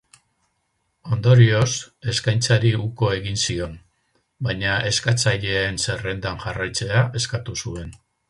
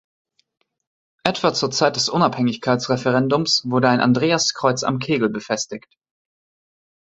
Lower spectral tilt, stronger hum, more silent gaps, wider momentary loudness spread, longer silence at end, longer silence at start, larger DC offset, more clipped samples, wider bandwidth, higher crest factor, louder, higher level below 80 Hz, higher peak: about the same, -4.5 dB/octave vs -4.5 dB/octave; neither; neither; first, 12 LU vs 8 LU; second, 0.35 s vs 1.35 s; second, 1.05 s vs 1.25 s; neither; neither; first, 11.5 kHz vs 8.2 kHz; about the same, 20 dB vs 20 dB; about the same, -21 LUFS vs -19 LUFS; first, -44 dBFS vs -60 dBFS; about the same, -2 dBFS vs 0 dBFS